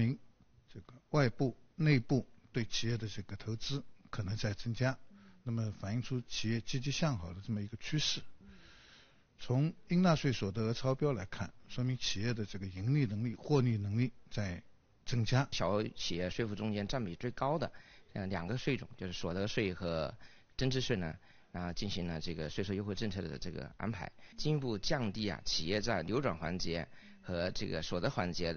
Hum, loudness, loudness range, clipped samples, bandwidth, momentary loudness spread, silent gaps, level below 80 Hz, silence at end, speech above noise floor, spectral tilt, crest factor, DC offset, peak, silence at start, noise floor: none; -37 LUFS; 4 LU; under 0.1%; 6.8 kHz; 11 LU; none; -54 dBFS; 0 s; 27 dB; -5 dB/octave; 22 dB; under 0.1%; -14 dBFS; 0 s; -63 dBFS